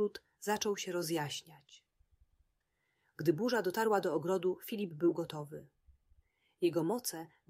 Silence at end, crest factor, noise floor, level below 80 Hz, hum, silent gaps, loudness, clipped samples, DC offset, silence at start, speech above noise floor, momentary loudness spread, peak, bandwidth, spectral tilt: 0.25 s; 18 dB; -81 dBFS; -76 dBFS; none; none; -35 LUFS; under 0.1%; under 0.1%; 0 s; 46 dB; 11 LU; -18 dBFS; 16 kHz; -4.5 dB/octave